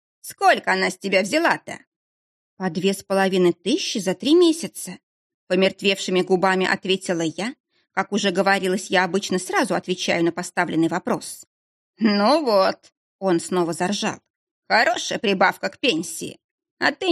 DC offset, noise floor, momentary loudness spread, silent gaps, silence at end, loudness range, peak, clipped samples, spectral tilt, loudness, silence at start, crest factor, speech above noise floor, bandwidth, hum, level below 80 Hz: under 0.1%; under -90 dBFS; 12 LU; 1.87-2.57 s, 5.03-5.47 s, 7.60-7.64 s, 11.47-11.93 s, 12.97-13.19 s, 14.30-14.63 s, 16.44-16.58 s, 16.71-16.77 s; 0 s; 2 LU; -2 dBFS; under 0.1%; -4 dB/octave; -21 LUFS; 0.25 s; 20 dB; over 69 dB; 13.5 kHz; none; -70 dBFS